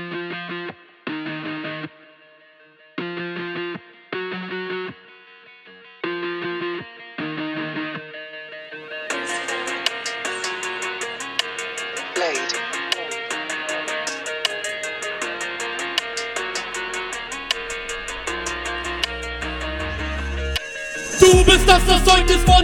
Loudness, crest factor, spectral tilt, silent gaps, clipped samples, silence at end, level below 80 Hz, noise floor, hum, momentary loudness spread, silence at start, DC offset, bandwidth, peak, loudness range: -22 LUFS; 22 dB; -3.5 dB/octave; none; under 0.1%; 0 s; -30 dBFS; -51 dBFS; none; 18 LU; 0 s; under 0.1%; 18.5 kHz; 0 dBFS; 12 LU